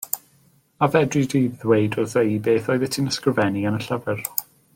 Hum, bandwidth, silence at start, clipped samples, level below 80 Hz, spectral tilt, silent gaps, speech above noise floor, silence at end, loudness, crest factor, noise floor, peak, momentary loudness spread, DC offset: none; 17 kHz; 0 s; under 0.1%; -60 dBFS; -5.5 dB/octave; none; 38 dB; 0.35 s; -22 LUFS; 22 dB; -59 dBFS; 0 dBFS; 6 LU; under 0.1%